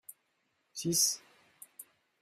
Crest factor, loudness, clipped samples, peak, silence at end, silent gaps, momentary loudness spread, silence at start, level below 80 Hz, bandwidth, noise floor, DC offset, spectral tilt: 22 dB; -30 LUFS; under 0.1%; -16 dBFS; 0.4 s; none; 25 LU; 0.1 s; -76 dBFS; 16 kHz; -78 dBFS; under 0.1%; -2 dB/octave